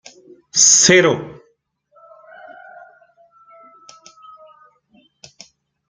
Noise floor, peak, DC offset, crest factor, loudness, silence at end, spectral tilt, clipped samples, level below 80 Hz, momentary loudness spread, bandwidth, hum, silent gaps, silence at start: -62 dBFS; 0 dBFS; under 0.1%; 22 dB; -11 LUFS; 4.6 s; -1.5 dB/octave; under 0.1%; -62 dBFS; 17 LU; 10.5 kHz; none; none; 0.55 s